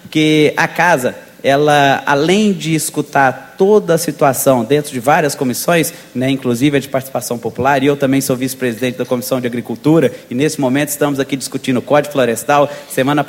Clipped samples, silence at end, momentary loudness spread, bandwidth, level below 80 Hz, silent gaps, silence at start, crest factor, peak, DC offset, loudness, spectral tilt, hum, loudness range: under 0.1%; 0 s; 8 LU; 17 kHz; -54 dBFS; none; 0.05 s; 14 dB; 0 dBFS; under 0.1%; -14 LUFS; -5 dB/octave; none; 3 LU